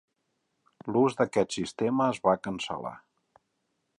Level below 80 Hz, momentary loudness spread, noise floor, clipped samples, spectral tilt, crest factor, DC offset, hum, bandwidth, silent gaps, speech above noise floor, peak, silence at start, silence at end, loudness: -66 dBFS; 11 LU; -78 dBFS; under 0.1%; -5.5 dB/octave; 22 dB; under 0.1%; none; 11.5 kHz; none; 51 dB; -8 dBFS; 0.85 s; 1 s; -28 LUFS